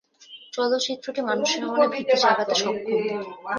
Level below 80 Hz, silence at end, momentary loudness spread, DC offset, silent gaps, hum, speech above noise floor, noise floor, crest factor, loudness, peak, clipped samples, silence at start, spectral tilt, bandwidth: -74 dBFS; 0 s; 9 LU; under 0.1%; none; none; 24 dB; -48 dBFS; 18 dB; -23 LUFS; -6 dBFS; under 0.1%; 0.3 s; -2.5 dB/octave; 10 kHz